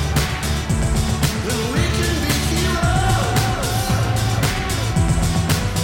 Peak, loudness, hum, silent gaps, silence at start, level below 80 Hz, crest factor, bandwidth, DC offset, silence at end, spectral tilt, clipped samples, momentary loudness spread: -6 dBFS; -19 LUFS; none; none; 0 s; -26 dBFS; 12 dB; 17 kHz; under 0.1%; 0 s; -4.5 dB/octave; under 0.1%; 3 LU